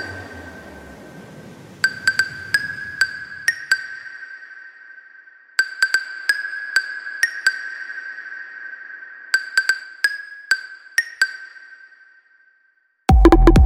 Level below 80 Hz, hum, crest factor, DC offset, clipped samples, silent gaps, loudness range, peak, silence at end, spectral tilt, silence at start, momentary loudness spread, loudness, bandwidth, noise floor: -26 dBFS; none; 20 dB; under 0.1%; under 0.1%; none; 2 LU; 0 dBFS; 0 s; -4.5 dB/octave; 0 s; 21 LU; -20 LUFS; 16 kHz; -62 dBFS